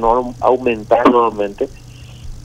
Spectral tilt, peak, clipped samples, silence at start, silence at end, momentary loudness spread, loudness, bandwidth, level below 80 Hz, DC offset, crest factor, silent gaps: -6.5 dB/octave; 0 dBFS; under 0.1%; 0 s; 0.05 s; 15 LU; -15 LUFS; 11 kHz; -36 dBFS; under 0.1%; 16 dB; none